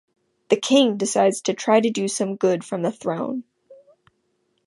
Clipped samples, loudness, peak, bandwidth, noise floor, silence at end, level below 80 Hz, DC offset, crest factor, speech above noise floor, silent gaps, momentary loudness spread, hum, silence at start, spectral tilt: under 0.1%; -21 LUFS; -4 dBFS; 11.5 kHz; -70 dBFS; 0.95 s; -74 dBFS; under 0.1%; 18 dB; 49 dB; none; 9 LU; none; 0.5 s; -4 dB/octave